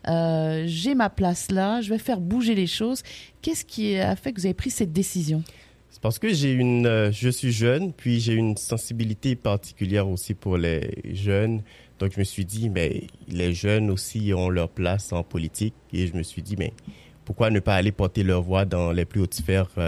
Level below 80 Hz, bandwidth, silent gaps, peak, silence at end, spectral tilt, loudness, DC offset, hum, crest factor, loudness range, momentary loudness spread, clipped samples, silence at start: -44 dBFS; 14.5 kHz; none; -6 dBFS; 0 s; -6 dB/octave; -25 LUFS; under 0.1%; none; 18 dB; 4 LU; 8 LU; under 0.1%; 0.05 s